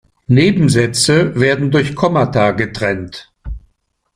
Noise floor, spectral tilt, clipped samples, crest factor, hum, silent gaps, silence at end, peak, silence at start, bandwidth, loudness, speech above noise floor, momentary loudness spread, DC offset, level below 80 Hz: -63 dBFS; -5.5 dB/octave; under 0.1%; 14 dB; none; none; 0.55 s; 0 dBFS; 0.3 s; 15.5 kHz; -14 LUFS; 49 dB; 20 LU; under 0.1%; -38 dBFS